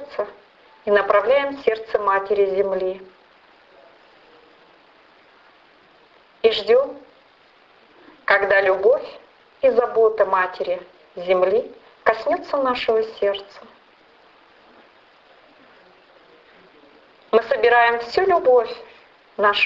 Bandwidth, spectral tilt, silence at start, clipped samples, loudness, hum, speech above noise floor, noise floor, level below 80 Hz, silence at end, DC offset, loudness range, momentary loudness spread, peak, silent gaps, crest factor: 7.2 kHz; -5 dB/octave; 0 s; under 0.1%; -19 LUFS; none; 35 dB; -54 dBFS; -60 dBFS; 0 s; under 0.1%; 9 LU; 15 LU; -2 dBFS; none; 20 dB